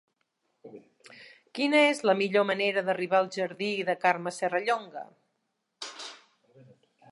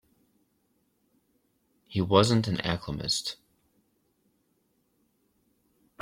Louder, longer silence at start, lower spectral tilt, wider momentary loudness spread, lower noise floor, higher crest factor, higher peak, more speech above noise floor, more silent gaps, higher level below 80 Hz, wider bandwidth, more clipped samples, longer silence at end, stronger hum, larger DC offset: about the same, -27 LUFS vs -27 LUFS; second, 0.65 s vs 1.9 s; about the same, -4 dB/octave vs -5 dB/octave; first, 20 LU vs 14 LU; first, -80 dBFS vs -72 dBFS; second, 20 dB vs 26 dB; second, -10 dBFS vs -6 dBFS; first, 53 dB vs 46 dB; neither; second, -84 dBFS vs -58 dBFS; second, 11.5 kHz vs 16 kHz; neither; second, 0.95 s vs 2.65 s; neither; neither